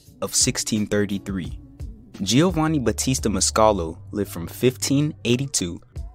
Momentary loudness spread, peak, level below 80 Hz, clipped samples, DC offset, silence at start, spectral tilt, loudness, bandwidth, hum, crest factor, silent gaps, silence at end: 14 LU; -2 dBFS; -40 dBFS; under 0.1%; under 0.1%; 0.2 s; -4 dB/octave; -22 LUFS; 16 kHz; none; 20 dB; none; 0 s